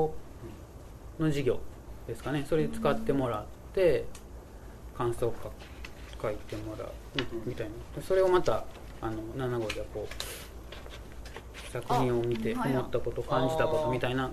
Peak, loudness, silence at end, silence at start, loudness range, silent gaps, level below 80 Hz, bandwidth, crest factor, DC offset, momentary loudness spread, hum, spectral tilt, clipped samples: -12 dBFS; -32 LUFS; 0 s; 0 s; 6 LU; none; -46 dBFS; 14 kHz; 18 dB; under 0.1%; 18 LU; none; -6 dB/octave; under 0.1%